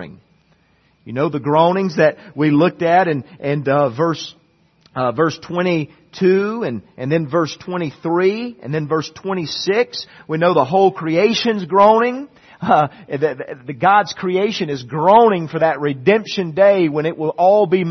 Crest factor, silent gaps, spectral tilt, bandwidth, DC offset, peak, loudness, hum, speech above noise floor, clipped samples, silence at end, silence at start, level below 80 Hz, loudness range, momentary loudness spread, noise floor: 16 dB; none; -6.5 dB/octave; 6.4 kHz; under 0.1%; 0 dBFS; -17 LUFS; none; 41 dB; under 0.1%; 0 s; 0 s; -60 dBFS; 5 LU; 11 LU; -57 dBFS